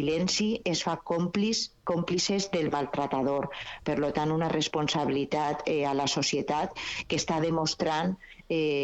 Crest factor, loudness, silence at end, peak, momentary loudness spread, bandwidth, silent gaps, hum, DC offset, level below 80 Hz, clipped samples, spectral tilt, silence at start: 14 dB; -29 LUFS; 0 s; -14 dBFS; 5 LU; 8.4 kHz; none; none; under 0.1%; -56 dBFS; under 0.1%; -4.5 dB/octave; 0 s